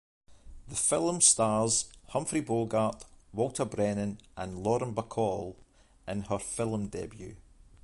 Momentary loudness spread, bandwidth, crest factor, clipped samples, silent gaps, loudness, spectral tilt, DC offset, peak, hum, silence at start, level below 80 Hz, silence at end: 18 LU; 11.5 kHz; 22 dB; under 0.1%; none; -30 LUFS; -4 dB/octave; under 0.1%; -10 dBFS; none; 0.3 s; -56 dBFS; 0.45 s